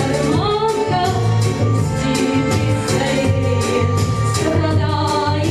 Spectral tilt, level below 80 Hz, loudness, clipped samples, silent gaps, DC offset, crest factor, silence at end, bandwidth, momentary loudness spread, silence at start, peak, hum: -6 dB/octave; -36 dBFS; -17 LUFS; under 0.1%; none; under 0.1%; 14 dB; 0 s; 14 kHz; 1 LU; 0 s; -4 dBFS; none